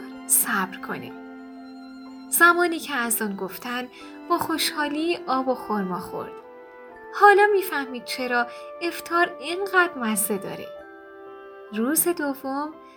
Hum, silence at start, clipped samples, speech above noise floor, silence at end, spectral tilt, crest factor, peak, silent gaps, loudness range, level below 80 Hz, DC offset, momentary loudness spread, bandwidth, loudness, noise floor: none; 0 s; under 0.1%; 20 dB; 0.05 s; -2.5 dB/octave; 22 dB; -2 dBFS; none; 5 LU; -68 dBFS; under 0.1%; 24 LU; over 20 kHz; -23 LUFS; -44 dBFS